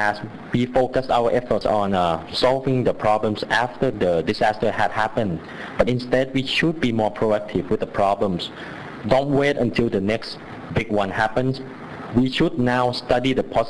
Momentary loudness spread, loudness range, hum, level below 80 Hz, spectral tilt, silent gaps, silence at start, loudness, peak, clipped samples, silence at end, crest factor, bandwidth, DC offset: 8 LU; 2 LU; none; -42 dBFS; -6.5 dB/octave; none; 0 s; -21 LUFS; -2 dBFS; under 0.1%; 0 s; 18 dB; 11 kHz; under 0.1%